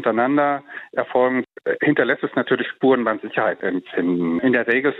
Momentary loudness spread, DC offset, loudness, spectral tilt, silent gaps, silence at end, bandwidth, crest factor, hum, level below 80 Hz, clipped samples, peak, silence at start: 7 LU; under 0.1%; -20 LUFS; -8.5 dB/octave; none; 0 s; 4.1 kHz; 16 dB; none; -70 dBFS; under 0.1%; -4 dBFS; 0 s